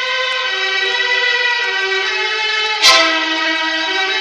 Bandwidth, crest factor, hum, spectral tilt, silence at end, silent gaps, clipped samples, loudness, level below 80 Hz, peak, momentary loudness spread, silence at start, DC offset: 12 kHz; 16 dB; none; 1 dB/octave; 0 s; none; under 0.1%; -13 LUFS; -60 dBFS; 0 dBFS; 7 LU; 0 s; under 0.1%